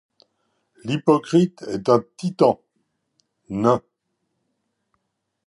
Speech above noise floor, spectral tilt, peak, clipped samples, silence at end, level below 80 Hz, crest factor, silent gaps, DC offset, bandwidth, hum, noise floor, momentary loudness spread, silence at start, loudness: 57 dB; -7.5 dB/octave; -2 dBFS; under 0.1%; 1.7 s; -62 dBFS; 22 dB; none; under 0.1%; 11.5 kHz; none; -76 dBFS; 13 LU; 0.85 s; -21 LUFS